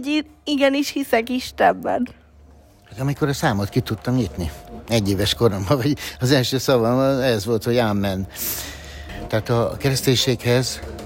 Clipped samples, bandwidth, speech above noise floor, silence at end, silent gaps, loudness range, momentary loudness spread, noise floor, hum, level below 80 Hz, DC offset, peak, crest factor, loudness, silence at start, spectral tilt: under 0.1%; 16.5 kHz; 28 dB; 0 s; none; 3 LU; 8 LU; -48 dBFS; none; -44 dBFS; under 0.1%; -2 dBFS; 18 dB; -21 LUFS; 0 s; -5 dB/octave